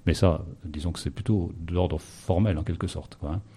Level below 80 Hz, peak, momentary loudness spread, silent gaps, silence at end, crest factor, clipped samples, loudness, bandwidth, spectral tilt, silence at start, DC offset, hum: -38 dBFS; -6 dBFS; 10 LU; none; 0.1 s; 20 dB; under 0.1%; -28 LUFS; 13 kHz; -7 dB/octave; 0.05 s; under 0.1%; none